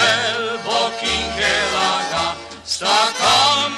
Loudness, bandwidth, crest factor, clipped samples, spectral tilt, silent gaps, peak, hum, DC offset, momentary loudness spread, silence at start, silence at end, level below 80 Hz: -17 LUFS; 14 kHz; 18 dB; under 0.1%; -1 dB/octave; none; -2 dBFS; none; under 0.1%; 9 LU; 0 s; 0 s; -44 dBFS